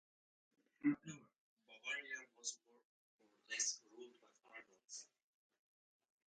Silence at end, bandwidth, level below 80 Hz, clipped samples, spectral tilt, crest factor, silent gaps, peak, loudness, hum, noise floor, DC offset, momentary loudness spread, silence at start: 1.25 s; 9.4 kHz; under -90 dBFS; under 0.1%; -1.5 dB/octave; 24 dB; 1.38-1.57 s, 2.85-3.19 s; -28 dBFS; -45 LUFS; none; -67 dBFS; under 0.1%; 20 LU; 0.8 s